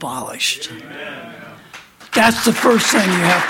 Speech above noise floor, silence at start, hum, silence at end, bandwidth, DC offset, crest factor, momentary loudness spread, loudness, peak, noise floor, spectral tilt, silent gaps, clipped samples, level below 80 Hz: 24 dB; 0 s; none; 0 s; 17 kHz; under 0.1%; 18 dB; 20 LU; -15 LUFS; 0 dBFS; -40 dBFS; -3 dB/octave; none; under 0.1%; -54 dBFS